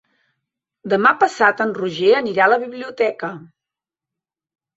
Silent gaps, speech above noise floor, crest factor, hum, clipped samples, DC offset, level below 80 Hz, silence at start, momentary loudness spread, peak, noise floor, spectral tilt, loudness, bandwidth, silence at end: none; 70 dB; 18 dB; none; under 0.1%; under 0.1%; -66 dBFS; 0.85 s; 14 LU; -2 dBFS; -87 dBFS; -5 dB/octave; -17 LUFS; 8 kHz; 1.3 s